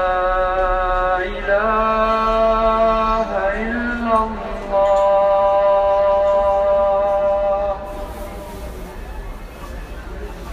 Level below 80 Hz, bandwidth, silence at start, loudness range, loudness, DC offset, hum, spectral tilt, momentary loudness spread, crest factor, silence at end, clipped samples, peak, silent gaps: -32 dBFS; 13.5 kHz; 0 s; 6 LU; -17 LUFS; under 0.1%; none; -6 dB/octave; 18 LU; 12 dB; 0 s; under 0.1%; -6 dBFS; none